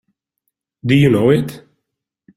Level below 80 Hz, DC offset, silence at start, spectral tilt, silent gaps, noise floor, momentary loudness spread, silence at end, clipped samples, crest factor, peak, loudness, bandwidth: -50 dBFS; under 0.1%; 0.85 s; -7.5 dB/octave; none; -77 dBFS; 15 LU; 0.8 s; under 0.1%; 16 dB; -2 dBFS; -14 LUFS; 14 kHz